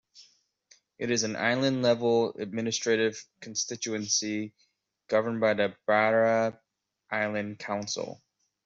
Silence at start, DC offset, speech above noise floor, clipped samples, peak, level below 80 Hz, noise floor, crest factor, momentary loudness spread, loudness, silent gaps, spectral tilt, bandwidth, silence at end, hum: 0.15 s; under 0.1%; 36 dB; under 0.1%; -10 dBFS; -74 dBFS; -64 dBFS; 20 dB; 11 LU; -28 LUFS; none; -3.5 dB/octave; 8 kHz; 0.5 s; none